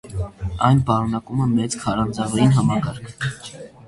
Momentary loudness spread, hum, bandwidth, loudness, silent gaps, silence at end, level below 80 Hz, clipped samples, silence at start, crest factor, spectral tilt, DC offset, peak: 13 LU; none; 11.5 kHz; -21 LUFS; none; 0.2 s; -40 dBFS; under 0.1%; 0.05 s; 18 dB; -6.5 dB/octave; under 0.1%; -2 dBFS